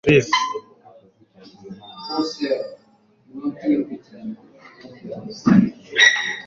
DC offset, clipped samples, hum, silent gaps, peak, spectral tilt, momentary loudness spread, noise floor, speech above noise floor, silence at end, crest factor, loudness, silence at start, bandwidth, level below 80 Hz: under 0.1%; under 0.1%; none; none; -2 dBFS; -4.5 dB/octave; 25 LU; -57 dBFS; 38 dB; 0 s; 20 dB; -19 LUFS; 0.05 s; 7.6 kHz; -54 dBFS